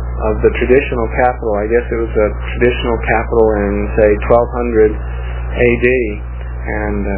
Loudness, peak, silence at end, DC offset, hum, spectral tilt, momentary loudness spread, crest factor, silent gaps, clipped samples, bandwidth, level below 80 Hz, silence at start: -14 LUFS; 0 dBFS; 0 s; under 0.1%; 60 Hz at -20 dBFS; -11 dB/octave; 10 LU; 14 dB; none; under 0.1%; 3.8 kHz; -22 dBFS; 0 s